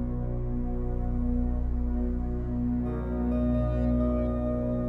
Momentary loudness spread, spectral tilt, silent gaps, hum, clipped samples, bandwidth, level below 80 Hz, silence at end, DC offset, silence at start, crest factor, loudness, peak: 6 LU; -11.5 dB/octave; none; 60 Hz at -30 dBFS; under 0.1%; 3.9 kHz; -30 dBFS; 0 s; under 0.1%; 0 s; 12 dB; -30 LUFS; -16 dBFS